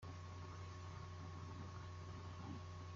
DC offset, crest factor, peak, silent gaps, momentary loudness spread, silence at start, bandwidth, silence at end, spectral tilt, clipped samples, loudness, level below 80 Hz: under 0.1%; 12 dB; -40 dBFS; none; 1 LU; 0 s; 7.6 kHz; 0 s; -6 dB/octave; under 0.1%; -53 LUFS; -70 dBFS